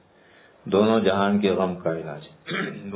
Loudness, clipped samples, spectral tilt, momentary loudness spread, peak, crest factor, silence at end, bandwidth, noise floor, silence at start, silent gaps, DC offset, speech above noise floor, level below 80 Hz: -23 LUFS; under 0.1%; -10.5 dB/octave; 16 LU; -6 dBFS; 18 dB; 0 s; 4 kHz; -54 dBFS; 0.65 s; none; under 0.1%; 31 dB; -56 dBFS